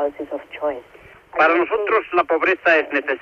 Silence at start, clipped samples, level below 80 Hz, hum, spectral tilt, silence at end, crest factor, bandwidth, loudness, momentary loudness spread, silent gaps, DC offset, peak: 0 s; under 0.1%; -60 dBFS; none; -5 dB/octave; 0.05 s; 16 dB; 7 kHz; -19 LUFS; 13 LU; none; under 0.1%; -4 dBFS